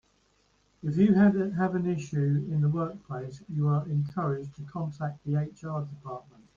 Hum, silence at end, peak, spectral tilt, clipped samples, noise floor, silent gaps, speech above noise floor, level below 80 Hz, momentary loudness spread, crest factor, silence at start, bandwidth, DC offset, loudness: none; 0.35 s; -12 dBFS; -9.5 dB/octave; under 0.1%; -68 dBFS; none; 40 dB; -62 dBFS; 15 LU; 18 dB; 0.85 s; 7.2 kHz; under 0.1%; -29 LUFS